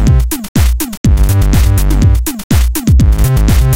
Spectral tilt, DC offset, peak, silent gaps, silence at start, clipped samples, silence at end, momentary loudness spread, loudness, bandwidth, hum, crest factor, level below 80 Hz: -6 dB/octave; under 0.1%; 0 dBFS; 0.49-0.55 s, 0.97-1.04 s, 2.44-2.50 s; 0 s; under 0.1%; 0 s; 4 LU; -11 LUFS; 17 kHz; none; 8 dB; -10 dBFS